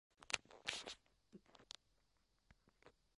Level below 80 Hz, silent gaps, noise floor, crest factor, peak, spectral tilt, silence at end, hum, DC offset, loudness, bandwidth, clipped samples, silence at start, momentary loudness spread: -78 dBFS; none; -82 dBFS; 38 dB; -16 dBFS; 0 dB/octave; 0.3 s; none; under 0.1%; -49 LUFS; 11.5 kHz; under 0.1%; 0.2 s; 21 LU